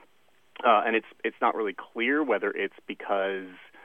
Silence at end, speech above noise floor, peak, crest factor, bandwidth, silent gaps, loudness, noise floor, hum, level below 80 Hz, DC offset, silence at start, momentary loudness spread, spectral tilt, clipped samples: 0.25 s; 39 dB; -8 dBFS; 20 dB; 4.2 kHz; none; -27 LUFS; -66 dBFS; none; -84 dBFS; under 0.1%; 0.6 s; 11 LU; -6 dB/octave; under 0.1%